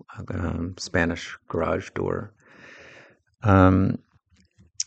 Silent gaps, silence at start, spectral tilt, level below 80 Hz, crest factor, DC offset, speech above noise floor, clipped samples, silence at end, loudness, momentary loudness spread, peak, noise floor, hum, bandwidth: none; 0.1 s; -6 dB/octave; -48 dBFS; 22 dB; under 0.1%; 39 dB; under 0.1%; 0.05 s; -24 LUFS; 16 LU; -4 dBFS; -62 dBFS; none; 8.6 kHz